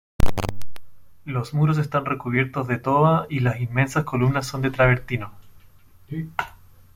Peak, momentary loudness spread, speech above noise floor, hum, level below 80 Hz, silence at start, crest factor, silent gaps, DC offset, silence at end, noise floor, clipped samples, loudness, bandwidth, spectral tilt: -4 dBFS; 13 LU; 27 dB; none; -38 dBFS; 0.2 s; 18 dB; none; under 0.1%; 0.45 s; -49 dBFS; under 0.1%; -23 LUFS; 16.5 kHz; -7 dB/octave